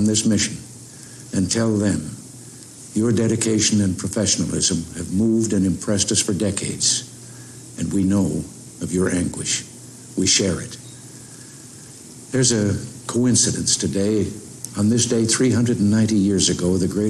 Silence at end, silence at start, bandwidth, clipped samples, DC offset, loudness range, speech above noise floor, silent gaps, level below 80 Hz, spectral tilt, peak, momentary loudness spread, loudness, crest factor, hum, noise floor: 0 s; 0 s; 13.5 kHz; under 0.1%; under 0.1%; 4 LU; 21 dB; none; -50 dBFS; -4 dB/octave; -4 dBFS; 21 LU; -19 LUFS; 16 dB; none; -40 dBFS